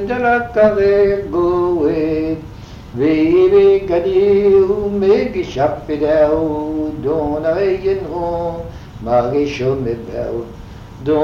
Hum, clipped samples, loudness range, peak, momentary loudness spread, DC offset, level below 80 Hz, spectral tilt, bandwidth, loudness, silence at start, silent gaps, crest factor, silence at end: none; under 0.1%; 5 LU; -2 dBFS; 14 LU; under 0.1%; -36 dBFS; -8 dB/octave; 6.8 kHz; -15 LUFS; 0 s; none; 14 dB; 0 s